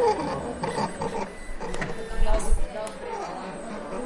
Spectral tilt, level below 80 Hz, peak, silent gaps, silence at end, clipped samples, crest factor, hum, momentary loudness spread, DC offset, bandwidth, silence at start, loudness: -5 dB/octave; -30 dBFS; -8 dBFS; none; 0 s; under 0.1%; 16 dB; none; 7 LU; under 0.1%; 11.5 kHz; 0 s; -31 LUFS